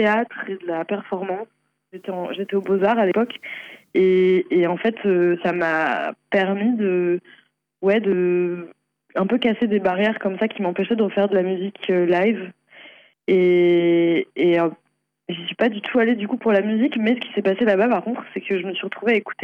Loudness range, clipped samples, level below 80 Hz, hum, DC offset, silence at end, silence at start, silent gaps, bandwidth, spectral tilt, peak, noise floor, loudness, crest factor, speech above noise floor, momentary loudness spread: 3 LU; under 0.1%; -68 dBFS; none; under 0.1%; 0 s; 0 s; none; 5.4 kHz; -8 dB/octave; -8 dBFS; -47 dBFS; -20 LUFS; 12 dB; 28 dB; 11 LU